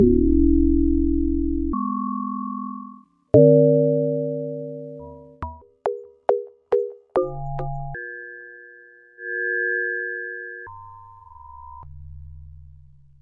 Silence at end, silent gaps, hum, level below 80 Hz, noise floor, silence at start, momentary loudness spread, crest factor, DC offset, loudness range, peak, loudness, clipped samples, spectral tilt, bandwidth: 0.65 s; none; none; -34 dBFS; -48 dBFS; 0 s; 25 LU; 22 dB; under 0.1%; 8 LU; -2 dBFS; -22 LUFS; under 0.1%; -11.5 dB/octave; 3.6 kHz